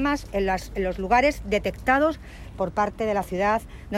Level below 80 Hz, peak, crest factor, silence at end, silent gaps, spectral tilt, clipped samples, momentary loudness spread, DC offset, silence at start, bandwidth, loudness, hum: -40 dBFS; -8 dBFS; 18 dB; 0 s; none; -5.5 dB/octave; under 0.1%; 8 LU; under 0.1%; 0 s; 16 kHz; -24 LUFS; none